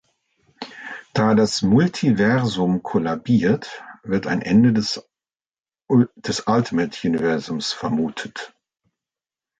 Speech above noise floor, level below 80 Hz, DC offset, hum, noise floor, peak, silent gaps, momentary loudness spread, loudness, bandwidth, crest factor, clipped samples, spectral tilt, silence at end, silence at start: over 71 dB; -54 dBFS; under 0.1%; none; under -90 dBFS; -4 dBFS; none; 17 LU; -20 LUFS; 9.2 kHz; 16 dB; under 0.1%; -6 dB/octave; 1.15 s; 0.6 s